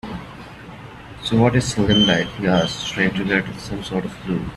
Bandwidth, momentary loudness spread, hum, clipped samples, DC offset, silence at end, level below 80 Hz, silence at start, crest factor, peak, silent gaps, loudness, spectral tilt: 12.5 kHz; 22 LU; none; under 0.1%; under 0.1%; 0 s; -42 dBFS; 0.05 s; 18 dB; -2 dBFS; none; -19 LUFS; -5 dB/octave